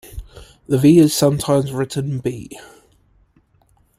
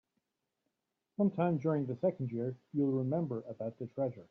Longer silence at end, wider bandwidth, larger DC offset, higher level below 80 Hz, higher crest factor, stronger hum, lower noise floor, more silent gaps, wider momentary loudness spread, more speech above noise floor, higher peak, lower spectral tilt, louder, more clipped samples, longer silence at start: first, 1.35 s vs 0.05 s; first, 16 kHz vs 6 kHz; neither; first, -44 dBFS vs -78 dBFS; about the same, 16 dB vs 16 dB; neither; second, -58 dBFS vs -87 dBFS; neither; first, 25 LU vs 9 LU; second, 42 dB vs 52 dB; first, -2 dBFS vs -20 dBFS; second, -6 dB/octave vs -10.5 dB/octave; first, -16 LUFS vs -35 LUFS; neither; second, 0.05 s vs 1.2 s